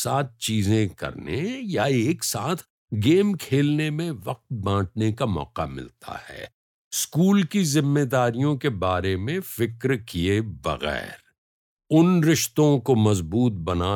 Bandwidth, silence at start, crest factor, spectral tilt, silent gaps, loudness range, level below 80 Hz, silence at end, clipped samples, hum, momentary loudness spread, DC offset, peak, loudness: 19.5 kHz; 0 s; 16 dB; -5.5 dB/octave; 2.70-2.88 s, 6.54-6.91 s, 11.38-11.77 s; 4 LU; -52 dBFS; 0 s; under 0.1%; none; 12 LU; under 0.1%; -6 dBFS; -23 LUFS